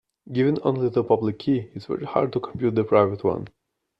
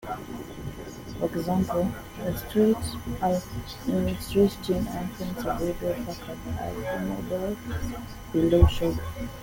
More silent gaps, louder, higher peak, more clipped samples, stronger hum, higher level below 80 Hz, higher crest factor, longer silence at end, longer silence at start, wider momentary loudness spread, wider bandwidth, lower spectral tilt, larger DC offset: neither; first, -24 LUFS vs -28 LUFS; about the same, -4 dBFS vs -4 dBFS; neither; neither; second, -60 dBFS vs -38 dBFS; about the same, 20 dB vs 24 dB; first, 0.5 s vs 0 s; first, 0.25 s vs 0 s; second, 11 LU vs 14 LU; second, 5.8 kHz vs 17 kHz; first, -9.5 dB/octave vs -7 dB/octave; neither